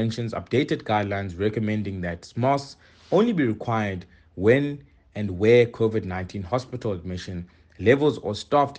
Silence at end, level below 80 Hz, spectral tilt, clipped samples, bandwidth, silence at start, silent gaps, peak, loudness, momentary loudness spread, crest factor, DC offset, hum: 0 s; -54 dBFS; -7 dB/octave; under 0.1%; 9 kHz; 0 s; none; -4 dBFS; -24 LUFS; 13 LU; 20 dB; under 0.1%; none